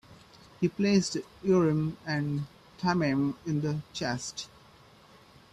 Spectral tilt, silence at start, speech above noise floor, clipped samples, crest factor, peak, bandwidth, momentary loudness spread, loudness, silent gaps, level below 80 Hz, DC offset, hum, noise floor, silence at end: -6 dB/octave; 0.1 s; 28 dB; under 0.1%; 18 dB; -12 dBFS; 12.5 kHz; 11 LU; -29 LUFS; none; -62 dBFS; under 0.1%; none; -56 dBFS; 1.05 s